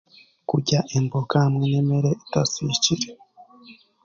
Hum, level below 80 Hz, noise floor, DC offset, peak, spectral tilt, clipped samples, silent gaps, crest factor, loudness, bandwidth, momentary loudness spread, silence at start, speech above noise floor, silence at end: none; -56 dBFS; -50 dBFS; under 0.1%; -6 dBFS; -5 dB/octave; under 0.1%; none; 18 dB; -22 LUFS; 7.6 kHz; 6 LU; 0.5 s; 28 dB; 0.3 s